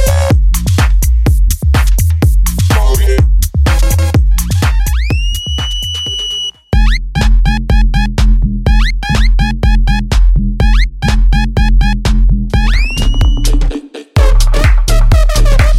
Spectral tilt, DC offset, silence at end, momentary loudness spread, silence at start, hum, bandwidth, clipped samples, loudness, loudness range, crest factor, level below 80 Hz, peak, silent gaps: -5 dB/octave; under 0.1%; 0 s; 4 LU; 0 s; none; 15 kHz; under 0.1%; -12 LUFS; 2 LU; 8 dB; -10 dBFS; 0 dBFS; none